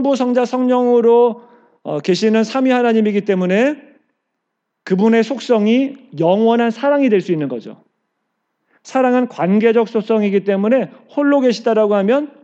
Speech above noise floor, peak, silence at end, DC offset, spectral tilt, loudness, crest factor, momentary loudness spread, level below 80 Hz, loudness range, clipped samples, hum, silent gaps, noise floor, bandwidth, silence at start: 60 dB; -2 dBFS; 0.15 s; under 0.1%; -6.5 dB/octave; -15 LUFS; 14 dB; 8 LU; -84 dBFS; 3 LU; under 0.1%; none; none; -74 dBFS; 8 kHz; 0 s